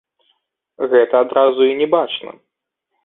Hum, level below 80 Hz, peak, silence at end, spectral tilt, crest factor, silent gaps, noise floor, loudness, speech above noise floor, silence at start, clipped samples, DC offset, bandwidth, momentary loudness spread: none; -66 dBFS; -2 dBFS; 0.75 s; -8.5 dB/octave; 16 dB; none; -75 dBFS; -16 LUFS; 61 dB; 0.8 s; under 0.1%; under 0.1%; 4 kHz; 12 LU